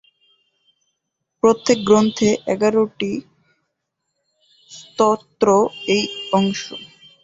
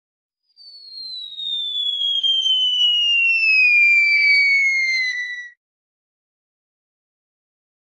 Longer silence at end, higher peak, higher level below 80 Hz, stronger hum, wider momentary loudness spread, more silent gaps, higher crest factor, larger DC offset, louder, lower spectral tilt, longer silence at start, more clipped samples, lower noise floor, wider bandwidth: second, 0.35 s vs 2.45 s; first, -2 dBFS vs -8 dBFS; first, -58 dBFS vs -82 dBFS; neither; second, 14 LU vs 17 LU; neither; first, 18 dB vs 12 dB; neither; second, -18 LUFS vs -14 LUFS; first, -5 dB/octave vs 5 dB/octave; first, 1.45 s vs 0.65 s; neither; first, -77 dBFS vs -46 dBFS; second, 7.8 kHz vs 11 kHz